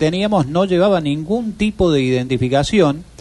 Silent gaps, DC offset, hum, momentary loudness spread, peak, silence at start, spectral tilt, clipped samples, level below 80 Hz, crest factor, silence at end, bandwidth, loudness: none; under 0.1%; none; 5 LU; -2 dBFS; 0 s; -6.5 dB/octave; under 0.1%; -38 dBFS; 14 dB; 0.15 s; 11.5 kHz; -16 LUFS